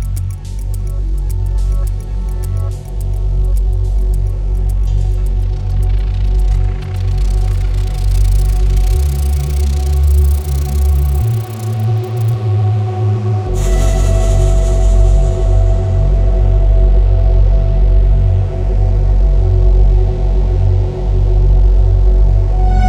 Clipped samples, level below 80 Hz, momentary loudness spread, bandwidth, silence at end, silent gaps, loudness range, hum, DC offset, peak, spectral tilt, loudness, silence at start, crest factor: under 0.1%; -12 dBFS; 7 LU; 11 kHz; 0 s; none; 5 LU; none; under 0.1%; 0 dBFS; -7.5 dB/octave; -15 LUFS; 0 s; 10 dB